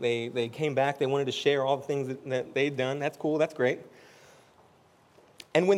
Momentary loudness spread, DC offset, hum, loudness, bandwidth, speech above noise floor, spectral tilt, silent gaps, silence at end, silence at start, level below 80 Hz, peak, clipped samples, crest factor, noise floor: 6 LU; under 0.1%; none; -29 LUFS; 13.5 kHz; 32 dB; -5.5 dB/octave; none; 0 s; 0 s; -78 dBFS; -8 dBFS; under 0.1%; 20 dB; -61 dBFS